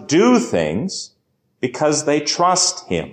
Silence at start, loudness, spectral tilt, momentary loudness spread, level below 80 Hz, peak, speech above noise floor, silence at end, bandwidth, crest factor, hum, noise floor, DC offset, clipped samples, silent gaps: 0 s; -17 LUFS; -3.5 dB/octave; 12 LU; -50 dBFS; -4 dBFS; 49 dB; 0 s; 9.8 kHz; 14 dB; none; -66 dBFS; under 0.1%; under 0.1%; none